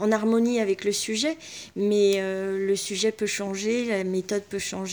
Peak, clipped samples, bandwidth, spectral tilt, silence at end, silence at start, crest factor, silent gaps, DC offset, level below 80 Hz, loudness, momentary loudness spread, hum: -10 dBFS; under 0.1%; over 20 kHz; -4 dB/octave; 0 s; 0 s; 16 dB; none; under 0.1%; -66 dBFS; -25 LUFS; 7 LU; none